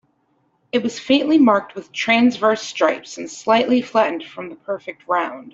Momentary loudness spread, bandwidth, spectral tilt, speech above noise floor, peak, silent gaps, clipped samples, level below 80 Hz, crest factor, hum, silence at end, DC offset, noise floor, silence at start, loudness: 14 LU; 7.8 kHz; -4 dB/octave; 46 dB; -2 dBFS; none; under 0.1%; -66 dBFS; 16 dB; none; 0.05 s; under 0.1%; -64 dBFS; 0.75 s; -19 LUFS